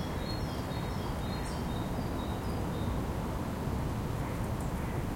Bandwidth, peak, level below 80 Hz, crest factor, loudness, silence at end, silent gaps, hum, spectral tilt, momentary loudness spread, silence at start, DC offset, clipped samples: 16.5 kHz; -22 dBFS; -42 dBFS; 12 dB; -35 LUFS; 0 s; none; none; -6.5 dB/octave; 1 LU; 0 s; under 0.1%; under 0.1%